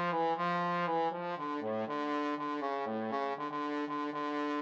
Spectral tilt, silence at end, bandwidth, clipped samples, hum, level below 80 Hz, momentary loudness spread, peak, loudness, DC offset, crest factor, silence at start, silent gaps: -6.5 dB/octave; 0 s; 7.8 kHz; under 0.1%; none; under -90 dBFS; 4 LU; -20 dBFS; -35 LUFS; under 0.1%; 14 dB; 0 s; none